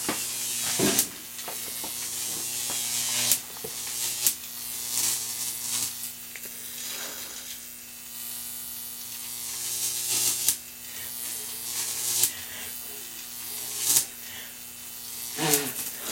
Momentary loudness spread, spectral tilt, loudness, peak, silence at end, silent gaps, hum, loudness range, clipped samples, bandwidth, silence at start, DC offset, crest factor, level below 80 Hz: 13 LU; -0.5 dB/octave; -28 LUFS; 0 dBFS; 0 s; none; none; 6 LU; under 0.1%; 16.5 kHz; 0 s; under 0.1%; 30 dB; -68 dBFS